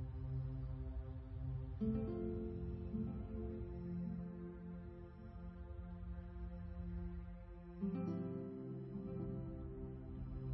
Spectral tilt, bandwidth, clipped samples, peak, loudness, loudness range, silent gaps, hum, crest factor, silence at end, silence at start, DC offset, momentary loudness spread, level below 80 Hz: -11 dB/octave; 5.6 kHz; under 0.1%; -30 dBFS; -47 LUFS; 5 LU; none; none; 16 dB; 0 s; 0 s; under 0.1%; 9 LU; -52 dBFS